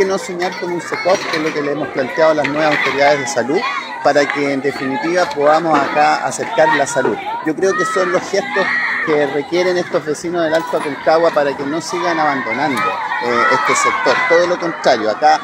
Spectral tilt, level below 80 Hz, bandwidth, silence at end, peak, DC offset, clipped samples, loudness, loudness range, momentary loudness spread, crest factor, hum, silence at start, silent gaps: -3.5 dB/octave; -60 dBFS; 16 kHz; 0 s; 0 dBFS; under 0.1%; under 0.1%; -15 LUFS; 2 LU; 7 LU; 16 dB; none; 0 s; none